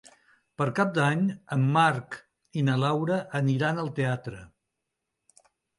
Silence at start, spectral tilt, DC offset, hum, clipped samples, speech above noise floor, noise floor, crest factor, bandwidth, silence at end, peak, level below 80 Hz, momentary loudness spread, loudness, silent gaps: 0.6 s; -7 dB/octave; under 0.1%; none; under 0.1%; 58 dB; -83 dBFS; 18 dB; 11.5 kHz; 1.35 s; -10 dBFS; -66 dBFS; 14 LU; -26 LUFS; none